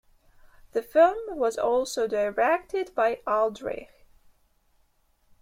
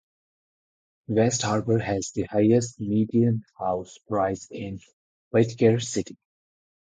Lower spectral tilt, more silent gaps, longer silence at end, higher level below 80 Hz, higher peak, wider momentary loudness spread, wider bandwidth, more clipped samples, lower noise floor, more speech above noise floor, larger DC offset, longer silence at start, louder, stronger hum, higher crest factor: second, -3.5 dB/octave vs -6 dB/octave; second, none vs 4.93-5.31 s; first, 1.55 s vs 0.8 s; about the same, -60 dBFS vs -56 dBFS; about the same, -8 dBFS vs -6 dBFS; about the same, 12 LU vs 13 LU; first, 16 kHz vs 9.4 kHz; neither; second, -67 dBFS vs under -90 dBFS; second, 42 dB vs over 66 dB; neither; second, 0.75 s vs 1.1 s; about the same, -26 LUFS vs -25 LUFS; neither; about the same, 18 dB vs 20 dB